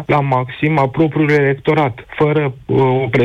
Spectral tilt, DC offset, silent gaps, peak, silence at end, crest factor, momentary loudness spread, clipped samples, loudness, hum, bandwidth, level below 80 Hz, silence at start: -8.5 dB/octave; under 0.1%; none; -4 dBFS; 0 s; 10 dB; 5 LU; under 0.1%; -15 LUFS; none; 7.2 kHz; -48 dBFS; 0 s